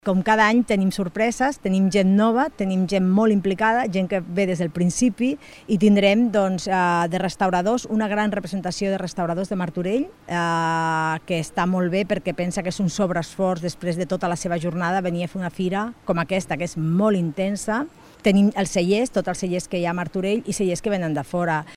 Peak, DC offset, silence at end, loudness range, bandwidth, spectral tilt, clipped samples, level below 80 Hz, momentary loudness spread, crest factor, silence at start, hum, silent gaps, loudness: -4 dBFS; under 0.1%; 0 s; 4 LU; 12.5 kHz; -6 dB/octave; under 0.1%; -50 dBFS; 8 LU; 18 dB; 0.05 s; none; none; -22 LUFS